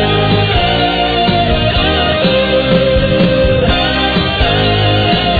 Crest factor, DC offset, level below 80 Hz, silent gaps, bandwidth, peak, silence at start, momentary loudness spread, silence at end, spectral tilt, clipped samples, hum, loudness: 12 dB; under 0.1%; -22 dBFS; none; 4.9 kHz; 0 dBFS; 0 s; 1 LU; 0 s; -8 dB/octave; under 0.1%; none; -11 LUFS